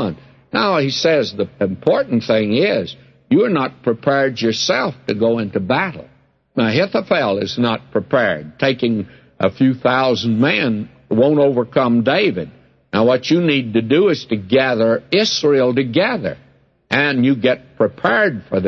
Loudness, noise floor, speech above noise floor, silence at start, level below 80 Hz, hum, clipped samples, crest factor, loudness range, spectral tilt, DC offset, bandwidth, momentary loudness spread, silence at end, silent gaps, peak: -17 LUFS; -42 dBFS; 26 dB; 0 s; -56 dBFS; none; under 0.1%; 14 dB; 3 LU; -5.5 dB/octave; under 0.1%; 7.2 kHz; 7 LU; 0 s; none; -2 dBFS